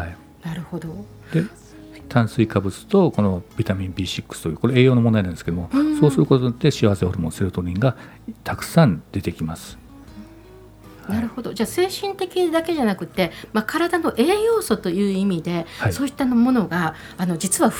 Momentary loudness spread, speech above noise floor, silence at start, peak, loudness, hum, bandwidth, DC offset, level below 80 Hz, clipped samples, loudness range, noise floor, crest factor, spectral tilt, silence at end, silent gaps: 14 LU; 24 dB; 0 s; 0 dBFS; -21 LUFS; none; 19.5 kHz; under 0.1%; -46 dBFS; under 0.1%; 6 LU; -44 dBFS; 20 dB; -6 dB/octave; 0 s; none